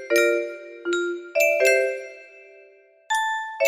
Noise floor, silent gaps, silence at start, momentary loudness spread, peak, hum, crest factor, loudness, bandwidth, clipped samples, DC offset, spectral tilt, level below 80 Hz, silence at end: -53 dBFS; none; 0 s; 15 LU; -6 dBFS; none; 18 dB; -22 LUFS; 15 kHz; under 0.1%; under 0.1%; -0.5 dB/octave; -76 dBFS; 0 s